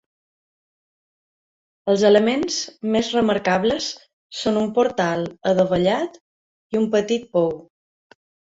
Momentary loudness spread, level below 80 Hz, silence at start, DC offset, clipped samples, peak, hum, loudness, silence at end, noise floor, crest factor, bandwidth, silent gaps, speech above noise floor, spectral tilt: 11 LU; -56 dBFS; 1.85 s; under 0.1%; under 0.1%; -2 dBFS; none; -20 LUFS; 0.95 s; under -90 dBFS; 20 dB; 8 kHz; 4.13-4.30 s, 6.21-6.70 s; over 70 dB; -5 dB/octave